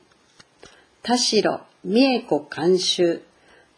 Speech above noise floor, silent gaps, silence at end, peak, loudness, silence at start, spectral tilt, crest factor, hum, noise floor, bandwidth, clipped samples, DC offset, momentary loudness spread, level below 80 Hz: 35 dB; none; 0.55 s; -6 dBFS; -21 LUFS; 1.05 s; -3.5 dB/octave; 18 dB; none; -55 dBFS; 10.5 kHz; under 0.1%; under 0.1%; 11 LU; -70 dBFS